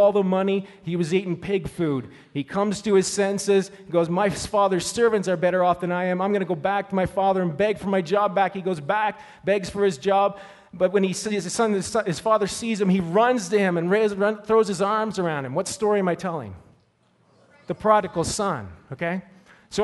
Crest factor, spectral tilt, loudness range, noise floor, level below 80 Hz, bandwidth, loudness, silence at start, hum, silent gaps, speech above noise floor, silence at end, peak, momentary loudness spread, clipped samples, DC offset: 18 dB; -5 dB/octave; 4 LU; -63 dBFS; -54 dBFS; 11.5 kHz; -23 LUFS; 0 s; none; none; 40 dB; 0 s; -4 dBFS; 8 LU; under 0.1%; under 0.1%